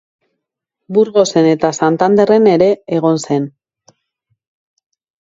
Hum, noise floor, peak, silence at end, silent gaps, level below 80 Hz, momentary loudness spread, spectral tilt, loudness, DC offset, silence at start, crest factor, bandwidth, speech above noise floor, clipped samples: none; -77 dBFS; 0 dBFS; 1.7 s; none; -58 dBFS; 8 LU; -6 dB/octave; -13 LUFS; under 0.1%; 0.9 s; 14 dB; 7.8 kHz; 66 dB; under 0.1%